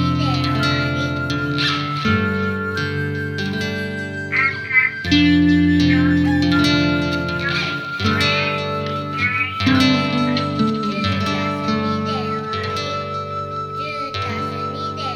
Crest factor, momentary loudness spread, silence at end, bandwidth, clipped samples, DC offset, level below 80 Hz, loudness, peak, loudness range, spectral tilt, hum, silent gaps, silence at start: 16 dB; 10 LU; 0 s; 13 kHz; under 0.1%; under 0.1%; -42 dBFS; -19 LUFS; -2 dBFS; 6 LU; -6 dB/octave; none; none; 0 s